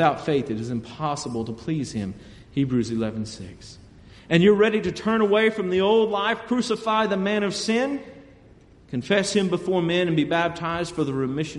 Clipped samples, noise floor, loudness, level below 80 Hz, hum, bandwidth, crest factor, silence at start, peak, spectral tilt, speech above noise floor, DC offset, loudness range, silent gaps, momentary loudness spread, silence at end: under 0.1%; -51 dBFS; -23 LUFS; -54 dBFS; none; 11.5 kHz; 18 dB; 0 s; -4 dBFS; -5.5 dB/octave; 28 dB; under 0.1%; 7 LU; none; 12 LU; 0 s